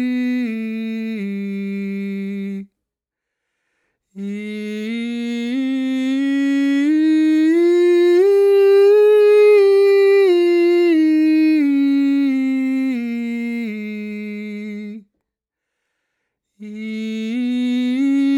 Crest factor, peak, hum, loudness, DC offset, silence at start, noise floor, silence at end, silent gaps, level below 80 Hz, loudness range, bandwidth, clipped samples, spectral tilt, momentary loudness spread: 12 dB; -6 dBFS; none; -16 LUFS; under 0.1%; 0 s; -83 dBFS; 0 s; none; -68 dBFS; 16 LU; 12 kHz; under 0.1%; -6.5 dB/octave; 16 LU